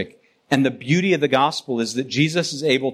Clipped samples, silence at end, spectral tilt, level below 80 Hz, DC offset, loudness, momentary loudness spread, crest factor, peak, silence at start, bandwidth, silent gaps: under 0.1%; 0 s; -5 dB/octave; -64 dBFS; under 0.1%; -20 LUFS; 6 LU; 16 dB; -4 dBFS; 0 s; 14 kHz; none